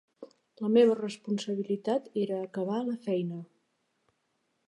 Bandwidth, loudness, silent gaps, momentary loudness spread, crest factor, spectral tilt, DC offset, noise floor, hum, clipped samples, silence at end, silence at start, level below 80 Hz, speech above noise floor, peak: 11 kHz; -30 LUFS; none; 10 LU; 20 dB; -7 dB/octave; under 0.1%; -77 dBFS; none; under 0.1%; 1.25 s; 0.2 s; -84 dBFS; 48 dB; -12 dBFS